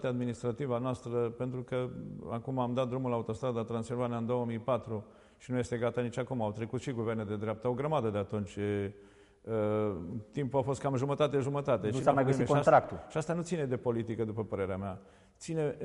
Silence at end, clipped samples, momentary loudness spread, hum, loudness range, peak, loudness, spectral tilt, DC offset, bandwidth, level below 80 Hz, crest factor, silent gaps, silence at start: 0 s; under 0.1%; 10 LU; none; 5 LU; -10 dBFS; -33 LUFS; -7 dB/octave; under 0.1%; 11.5 kHz; -62 dBFS; 22 dB; none; 0 s